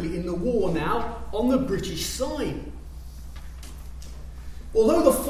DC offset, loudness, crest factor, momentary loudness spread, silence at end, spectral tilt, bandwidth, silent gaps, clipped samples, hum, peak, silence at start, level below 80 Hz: under 0.1%; -25 LUFS; 22 dB; 20 LU; 0 s; -5.5 dB/octave; 16 kHz; none; under 0.1%; none; -4 dBFS; 0 s; -38 dBFS